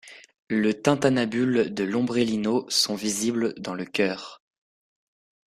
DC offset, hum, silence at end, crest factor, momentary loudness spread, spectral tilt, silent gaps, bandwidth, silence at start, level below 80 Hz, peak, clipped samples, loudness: under 0.1%; none; 1.15 s; 20 dB; 7 LU; -4 dB/octave; 0.39-0.47 s; 15 kHz; 0.05 s; -64 dBFS; -4 dBFS; under 0.1%; -24 LUFS